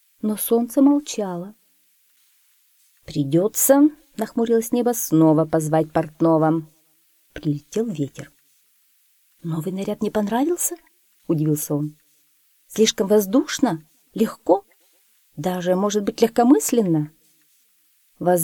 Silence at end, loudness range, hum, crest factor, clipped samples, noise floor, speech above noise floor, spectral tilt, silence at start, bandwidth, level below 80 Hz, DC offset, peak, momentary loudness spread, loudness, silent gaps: 0 s; 7 LU; none; 20 dB; under 0.1%; -61 dBFS; 42 dB; -5.5 dB/octave; 0.25 s; 19.5 kHz; -60 dBFS; under 0.1%; -2 dBFS; 14 LU; -21 LUFS; none